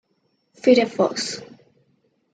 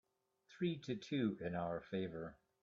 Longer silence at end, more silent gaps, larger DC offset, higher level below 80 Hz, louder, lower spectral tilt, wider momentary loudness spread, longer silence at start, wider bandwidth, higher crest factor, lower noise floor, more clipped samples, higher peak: first, 0.9 s vs 0.3 s; neither; neither; about the same, -72 dBFS vs -74 dBFS; first, -20 LUFS vs -43 LUFS; second, -4 dB/octave vs -6 dB/octave; first, 12 LU vs 7 LU; first, 0.65 s vs 0.5 s; first, 9.4 kHz vs 7.4 kHz; about the same, 20 dB vs 18 dB; second, -69 dBFS vs -73 dBFS; neither; first, -4 dBFS vs -26 dBFS